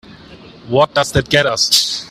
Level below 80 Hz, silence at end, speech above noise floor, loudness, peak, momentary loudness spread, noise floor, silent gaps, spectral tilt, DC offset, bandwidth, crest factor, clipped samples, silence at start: -40 dBFS; 0 s; 24 dB; -13 LUFS; 0 dBFS; 4 LU; -39 dBFS; none; -3 dB/octave; under 0.1%; 16 kHz; 16 dB; under 0.1%; 0.1 s